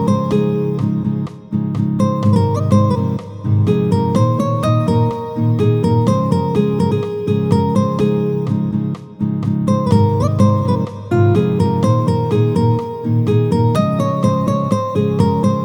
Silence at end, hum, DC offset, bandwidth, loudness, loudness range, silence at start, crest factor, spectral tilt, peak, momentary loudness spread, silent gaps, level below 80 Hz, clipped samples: 0 s; none; under 0.1%; 18 kHz; -16 LUFS; 2 LU; 0 s; 14 dB; -8.5 dB/octave; 0 dBFS; 5 LU; none; -46 dBFS; under 0.1%